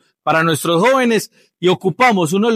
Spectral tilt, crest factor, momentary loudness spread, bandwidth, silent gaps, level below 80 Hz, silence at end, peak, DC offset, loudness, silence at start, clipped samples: -5 dB/octave; 12 dB; 6 LU; 16 kHz; none; -66 dBFS; 0 s; -4 dBFS; under 0.1%; -15 LUFS; 0.25 s; under 0.1%